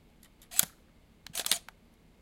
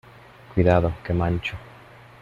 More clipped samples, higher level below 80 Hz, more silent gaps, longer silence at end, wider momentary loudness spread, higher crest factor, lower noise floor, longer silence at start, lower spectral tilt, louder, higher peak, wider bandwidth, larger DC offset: neither; second, -64 dBFS vs -42 dBFS; neither; about the same, 0.6 s vs 0.55 s; about the same, 10 LU vs 12 LU; first, 34 dB vs 18 dB; first, -61 dBFS vs -47 dBFS; about the same, 0.5 s vs 0.5 s; second, 1 dB/octave vs -8.5 dB/octave; second, -31 LUFS vs -23 LUFS; first, -2 dBFS vs -6 dBFS; first, 16.5 kHz vs 7.2 kHz; neither